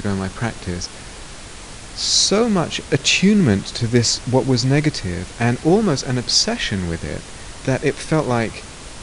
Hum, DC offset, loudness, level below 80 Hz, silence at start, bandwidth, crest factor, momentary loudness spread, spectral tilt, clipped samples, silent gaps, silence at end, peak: none; under 0.1%; -18 LUFS; -40 dBFS; 0 s; 11 kHz; 18 dB; 20 LU; -4 dB/octave; under 0.1%; none; 0 s; -2 dBFS